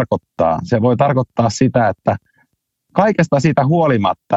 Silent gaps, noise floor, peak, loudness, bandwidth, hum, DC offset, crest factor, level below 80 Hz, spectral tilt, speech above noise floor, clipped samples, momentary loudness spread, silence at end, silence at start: none; -66 dBFS; 0 dBFS; -16 LUFS; 8.2 kHz; none; under 0.1%; 16 dB; -48 dBFS; -7 dB/octave; 52 dB; under 0.1%; 7 LU; 0 s; 0 s